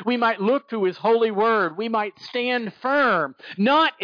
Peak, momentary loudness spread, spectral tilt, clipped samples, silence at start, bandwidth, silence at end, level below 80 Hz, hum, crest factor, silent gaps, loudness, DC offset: -8 dBFS; 7 LU; -6.5 dB/octave; under 0.1%; 0 s; 5.2 kHz; 0 s; -74 dBFS; none; 14 dB; none; -22 LUFS; under 0.1%